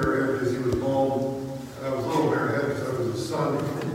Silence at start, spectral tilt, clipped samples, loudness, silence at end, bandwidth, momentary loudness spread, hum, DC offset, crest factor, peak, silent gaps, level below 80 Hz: 0 s; -6.5 dB/octave; under 0.1%; -26 LUFS; 0 s; 16.5 kHz; 7 LU; none; under 0.1%; 14 dB; -12 dBFS; none; -50 dBFS